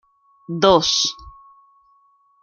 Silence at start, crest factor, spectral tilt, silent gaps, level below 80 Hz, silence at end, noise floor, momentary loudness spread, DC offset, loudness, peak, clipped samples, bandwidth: 0.5 s; 20 dB; -3 dB/octave; none; -50 dBFS; 1.1 s; -58 dBFS; 18 LU; under 0.1%; -17 LUFS; -2 dBFS; under 0.1%; 7.2 kHz